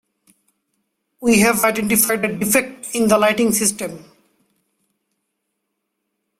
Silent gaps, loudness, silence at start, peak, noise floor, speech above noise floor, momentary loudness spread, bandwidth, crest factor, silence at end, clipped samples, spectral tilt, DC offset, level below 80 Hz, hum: none; -16 LUFS; 1.2 s; 0 dBFS; -76 dBFS; 58 dB; 9 LU; 16.5 kHz; 20 dB; 2.35 s; under 0.1%; -3.5 dB/octave; under 0.1%; -54 dBFS; none